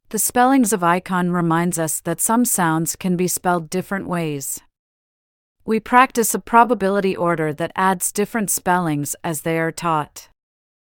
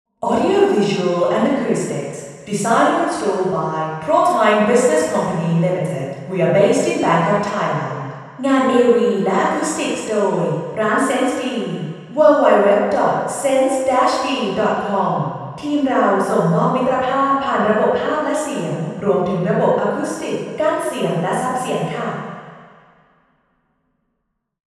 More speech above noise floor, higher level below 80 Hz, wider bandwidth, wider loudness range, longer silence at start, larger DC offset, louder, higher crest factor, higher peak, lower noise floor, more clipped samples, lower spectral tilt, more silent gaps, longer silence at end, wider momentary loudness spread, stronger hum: first, over 71 dB vs 56 dB; first, -54 dBFS vs -60 dBFS; first, 18.5 kHz vs 13.5 kHz; about the same, 3 LU vs 4 LU; about the same, 0.1 s vs 0.2 s; neither; about the same, -19 LUFS vs -17 LUFS; about the same, 20 dB vs 18 dB; about the same, 0 dBFS vs 0 dBFS; first, under -90 dBFS vs -73 dBFS; neither; about the same, -4.5 dB/octave vs -5.5 dB/octave; first, 4.79-5.55 s vs none; second, 0.55 s vs 2.1 s; about the same, 9 LU vs 10 LU; neither